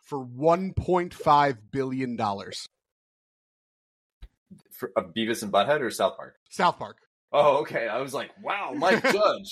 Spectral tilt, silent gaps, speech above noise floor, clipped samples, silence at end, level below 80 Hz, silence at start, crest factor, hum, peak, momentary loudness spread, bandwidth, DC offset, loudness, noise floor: -5 dB/octave; 2.92-4.21 s, 4.38-4.46 s, 6.37-6.46 s, 7.07-7.28 s; over 64 dB; under 0.1%; 0 s; -56 dBFS; 0.1 s; 18 dB; none; -8 dBFS; 16 LU; 15.5 kHz; under 0.1%; -25 LUFS; under -90 dBFS